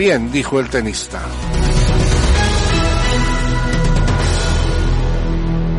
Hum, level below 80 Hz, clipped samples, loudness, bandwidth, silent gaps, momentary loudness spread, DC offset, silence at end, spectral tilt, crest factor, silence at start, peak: none; -18 dBFS; under 0.1%; -17 LUFS; 11.5 kHz; none; 5 LU; under 0.1%; 0 s; -5 dB/octave; 12 dB; 0 s; -4 dBFS